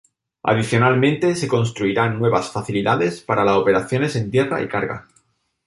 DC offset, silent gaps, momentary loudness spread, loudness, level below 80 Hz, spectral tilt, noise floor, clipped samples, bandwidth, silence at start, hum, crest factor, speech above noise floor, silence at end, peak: under 0.1%; none; 7 LU; -19 LUFS; -52 dBFS; -6 dB/octave; -62 dBFS; under 0.1%; 11.5 kHz; 0.45 s; none; 18 dB; 44 dB; 0.65 s; -2 dBFS